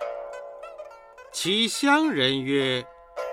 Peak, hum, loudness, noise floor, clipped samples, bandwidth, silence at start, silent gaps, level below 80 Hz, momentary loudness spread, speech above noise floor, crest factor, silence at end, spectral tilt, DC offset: -6 dBFS; none; -23 LUFS; -46 dBFS; under 0.1%; 16 kHz; 0 s; none; -64 dBFS; 20 LU; 23 dB; 20 dB; 0 s; -3.5 dB/octave; under 0.1%